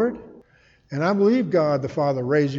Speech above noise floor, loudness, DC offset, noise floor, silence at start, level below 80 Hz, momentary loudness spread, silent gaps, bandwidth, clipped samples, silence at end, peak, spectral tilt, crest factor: 37 dB; -21 LUFS; under 0.1%; -57 dBFS; 0 s; -60 dBFS; 9 LU; none; 7.6 kHz; under 0.1%; 0 s; -8 dBFS; -8 dB/octave; 14 dB